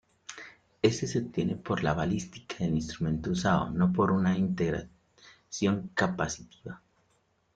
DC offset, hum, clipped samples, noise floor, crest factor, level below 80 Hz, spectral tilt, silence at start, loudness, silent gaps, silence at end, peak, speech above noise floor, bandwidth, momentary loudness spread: under 0.1%; none; under 0.1%; -71 dBFS; 20 dB; -54 dBFS; -6 dB/octave; 0.3 s; -29 LUFS; none; 0.8 s; -10 dBFS; 42 dB; 9 kHz; 19 LU